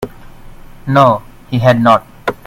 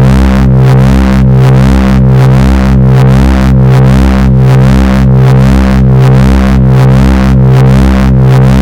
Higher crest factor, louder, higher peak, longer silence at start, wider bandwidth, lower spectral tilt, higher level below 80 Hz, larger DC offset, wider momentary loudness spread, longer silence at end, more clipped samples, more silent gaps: first, 14 dB vs 4 dB; second, -12 LUFS vs -5 LUFS; about the same, 0 dBFS vs 0 dBFS; about the same, 0 s vs 0 s; first, 16 kHz vs 9.8 kHz; about the same, -7.5 dB/octave vs -8 dB/octave; second, -40 dBFS vs -10 dBFS; second, under 0.1% vs 9%; first, 15 LU vs 2 LU; first, 0.15 s vs 0 s; first, 0.2% vs under 0.1%; neither